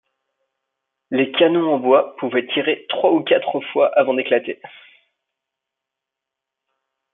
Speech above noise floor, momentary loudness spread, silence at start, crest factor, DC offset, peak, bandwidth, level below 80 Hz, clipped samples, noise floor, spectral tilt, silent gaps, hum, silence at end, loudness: 66 dB; 7 LU; 1.1 s; 18 dB; under 0.1%; -2 dBFS; 4 kHz; -74 dBFS; under 0.1%; -84 dBFS; -9 dB/octave; none; none; 2.45 s; -18 LUFS